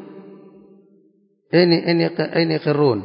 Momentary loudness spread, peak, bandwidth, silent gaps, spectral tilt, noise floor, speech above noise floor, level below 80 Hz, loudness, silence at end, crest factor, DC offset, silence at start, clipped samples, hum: 5 LU; -2 dBFS; 5.4 kHz; none; -11.5 dB/octave; -59 dBFS; 42 dB; -64 dBFS; -18 LUFS; 0 s; 18 dB; under 0.1%; 0 s; under 0.1%; none